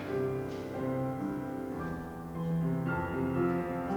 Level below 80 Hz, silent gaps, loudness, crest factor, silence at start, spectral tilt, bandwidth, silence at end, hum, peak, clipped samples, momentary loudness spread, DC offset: -54 dBFS; none; -34 LUFS; 14 dB; 0 s; -8.5 dB/octave; over 20 kHz; 0 s; none; -20 dBFS; under 0.1%; 7 LU; under 0.1%